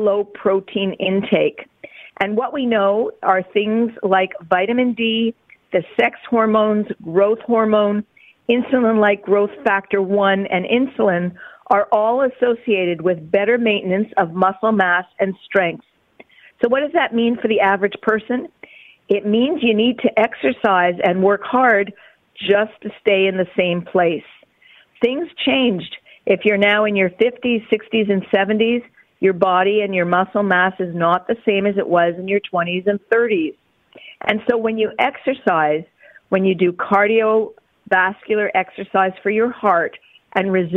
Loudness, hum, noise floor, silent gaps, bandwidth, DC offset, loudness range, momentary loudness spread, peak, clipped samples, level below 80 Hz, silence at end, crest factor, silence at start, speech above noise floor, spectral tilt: -18 LUFS; none; -51 dBFS; none; 4.1 kHz; under 0.1%; 2 LU; 6 LU; -2 dBFS; under 0.1%; -62 dBFS; 0 s; 16 dB; 0 s; 34 dB; -8 dB/octave